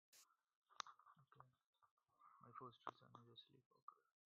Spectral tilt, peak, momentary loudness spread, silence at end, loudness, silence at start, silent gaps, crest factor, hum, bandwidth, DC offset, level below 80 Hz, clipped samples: -2 dB/octave; -26 dBFS; 10 LU; 0.25 s; -61 LUFS; 0.1 s; 0.56-0.62 s, 1.66-1.73 s, 1.91-1.97 s, 3.66-3.71 s, 3.82-3.88 s; 38 dB; none; 6.8 kHz; under 0.1%; under -90 dBFS; under 0.1%